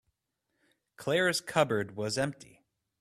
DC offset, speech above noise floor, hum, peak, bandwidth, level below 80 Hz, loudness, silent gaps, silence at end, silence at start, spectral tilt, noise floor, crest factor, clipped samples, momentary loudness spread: under 0.1%; 52 dB; none; -10 dBFS; 15 kHz; -68 dBFS; -30 LUFS; none; 0.6 s; 1 s; -4 dB/octave; -82 dBFS; 24 dB; under 0.1%; 10 LU